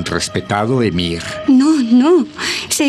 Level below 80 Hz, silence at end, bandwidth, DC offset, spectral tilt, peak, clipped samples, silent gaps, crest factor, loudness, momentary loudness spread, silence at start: -46 dBFS; 0 s; 14.5 kHz; under 0.1%; -4.5 dB/octave; -2 dBFS; under 0.1%; none; 12 dB; -14 LUFS; 8 LU; 0 s